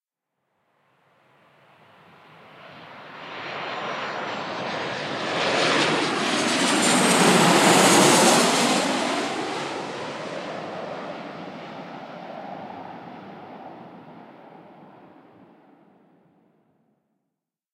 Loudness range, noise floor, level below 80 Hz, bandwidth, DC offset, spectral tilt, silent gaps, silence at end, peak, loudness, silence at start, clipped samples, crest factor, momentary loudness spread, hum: 22 LU; -83 dBFS; -74 dBFS; 16 kHz; under 0.1%; -3 dB/octave; none; 2.85 s; -4 dBFS; -21 LUFS; 2.55 s; under 0.1%; 22 dB; 25 LU; none